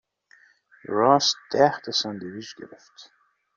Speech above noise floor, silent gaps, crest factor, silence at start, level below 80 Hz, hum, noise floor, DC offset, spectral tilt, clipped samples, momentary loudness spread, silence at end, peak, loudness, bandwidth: 34 dB; none; 22 dB; 0.9 s; -70 dBFS; none; -58 dBFS; under 0.1%; -3.5 dB/octave; under 0.1%; 24 LU; 0.55 s; -4 dBFS; -22 LUFS; 7.4 kHz